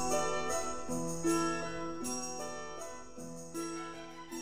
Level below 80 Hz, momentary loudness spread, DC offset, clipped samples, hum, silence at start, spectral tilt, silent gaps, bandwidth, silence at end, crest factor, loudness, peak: -60 dBFS; 13 LU; 0.5%; under 0.1%; none; 0 s; -3.5 dB/octave; none; 16 kHz; 0 s; 18 dB; -37 LUFS; -20 dBFS